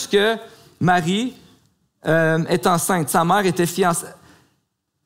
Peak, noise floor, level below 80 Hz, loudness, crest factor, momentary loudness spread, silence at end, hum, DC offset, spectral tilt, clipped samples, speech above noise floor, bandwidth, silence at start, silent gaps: -4 dBFS; -72 dBFS; -58 dBFS; -19 LUFS; 16 dB; 10 LU; 0.9 s; none; under 0.1%; -4.5 dB/octave; under 0.1%; 54 dB; 16 kHz; 0 s; none